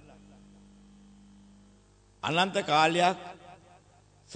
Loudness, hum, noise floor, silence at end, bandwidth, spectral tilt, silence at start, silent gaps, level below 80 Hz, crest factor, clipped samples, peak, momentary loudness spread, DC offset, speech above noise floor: -26 LUFS; 50 Hz at -55 dBFS; -60 dBFS; 0 s; 9.4 kHz; -4 dB/octave; 2.25 s; none; -66 dBFS; 24 dB; under 0.1%; -8 dBFS; 20 LU; under 0.1%; 34 dB